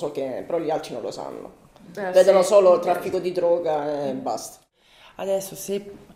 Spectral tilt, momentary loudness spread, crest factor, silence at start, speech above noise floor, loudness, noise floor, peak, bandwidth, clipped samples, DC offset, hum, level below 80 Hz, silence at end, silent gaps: -4.5 dB/octave; 17 LU; 18 dB; 0 s; 31 dB; -22 LUFS; -53 dBFS; -4 dBFS; 16 kHz; under 0.1%; under 0.1%; none; -64 dBFS; 0.05 s; none